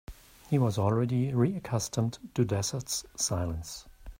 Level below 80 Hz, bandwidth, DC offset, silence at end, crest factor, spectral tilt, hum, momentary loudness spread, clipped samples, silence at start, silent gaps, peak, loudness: -52 dBFS; 16 kHz; under 0.1%; 0.05 s; 18 dB; -5.5 dB/octave; none; 8 LU; under 0.1%; 0.1 s; none; -12 dBFS; -30 LUFS